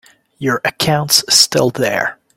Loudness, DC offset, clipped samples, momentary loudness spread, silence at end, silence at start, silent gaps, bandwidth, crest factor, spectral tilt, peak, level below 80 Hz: -13 LUFS; under 0.1%; under 0.1%; 10 LU; 0.25 s; 0.4 s; none; 17 kHz; 16 dB; -2.5 dB/octave; 0 dBFS; -52 dBFS